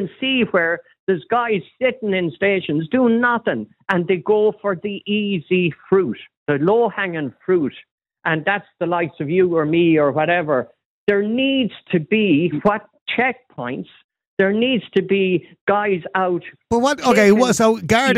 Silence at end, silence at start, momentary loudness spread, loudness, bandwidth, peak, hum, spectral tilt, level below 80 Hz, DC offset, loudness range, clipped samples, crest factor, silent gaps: 0 s; 0 s; 9 LU; -19 LUFS; 14 kHz; -4 dBFS; none; -5.5 dB/octave; -56 dBFS; under 0.1%; 3 LU; under 0.1%; 16 dB; 0.99-1.07 s, 6.37-6.46 s, 7.91-7.98 s, 10.85-11.07 s, 13.01-13.06 s, 14.04-14.09 s, 14.27-14.37 s, 15.61-15.67 s